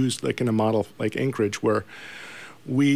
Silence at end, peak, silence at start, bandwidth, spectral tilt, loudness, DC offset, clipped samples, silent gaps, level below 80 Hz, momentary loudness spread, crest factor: 0 s; -10 dBFS; 0 s; 15.5 kHz; -6 dB/octave; -25 LUFS; 0.3%; under 0.1%; none; -64 dBFS; 16 LU; 14 dB